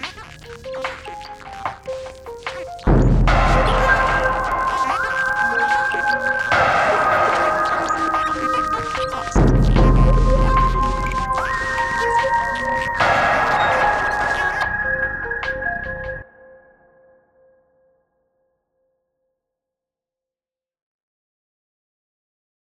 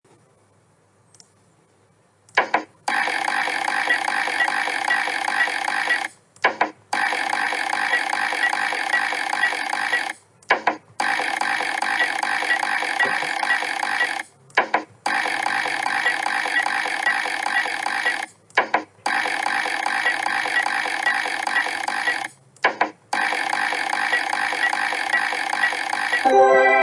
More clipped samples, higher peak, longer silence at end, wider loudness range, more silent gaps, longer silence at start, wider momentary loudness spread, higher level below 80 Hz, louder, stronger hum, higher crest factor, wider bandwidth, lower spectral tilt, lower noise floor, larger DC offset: neither; about the same, -2 dBFS vs -4 dBFS; first, 6.4 s vs 0 s; first, 7 LU vs 1 LU; neither; second, 0 s vs 2.35 s; first, 14 LU vs 3 LU; first, -26 dBFS vs -78 dBFS; first, -18 LUFS vs -21 LUFS; neither; about the same, 18 dB vs 18 dB; about the same, 11 kHz vs 11.5 kHz; first, -5.5 dB/octave vs -1 dB/octave; first, under -90 dBFS vs -59 dBFS; neither